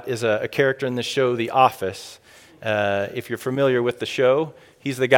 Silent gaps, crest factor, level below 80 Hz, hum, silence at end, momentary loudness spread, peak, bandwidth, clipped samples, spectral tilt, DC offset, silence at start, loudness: none; 22 dB; -66 dBFS; none; 0 s; 12 LU; 0 dBFS; 17.5 kHz; under 0.1%; -5 dB/octave; under 0.1%; 0 s; -22 LUFS